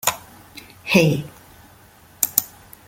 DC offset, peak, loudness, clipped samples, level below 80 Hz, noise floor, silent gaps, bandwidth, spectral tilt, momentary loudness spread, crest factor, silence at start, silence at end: under 0.1%; 0 dBFS; -19 LUFS; under 0.1%; -56 dBFS; -49 dBFS; none; 17 kHz; -4 dB/octave; 25 LU; 24 dB; 0.05 s; 0.4 s